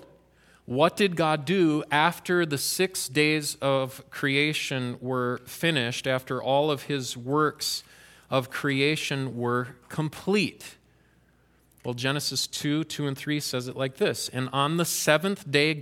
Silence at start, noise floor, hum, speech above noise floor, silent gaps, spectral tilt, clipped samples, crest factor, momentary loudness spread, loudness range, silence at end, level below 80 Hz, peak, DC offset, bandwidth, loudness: 0 s; -62 dBFS; none; 36 dB; none; -4 dB/octave; under 0.1%; 24 dB; 8 LU; 5 LU; 0 s; -66 dBFS; -4 dBFS; under 0.1%; 17 kHz; -26 LUFS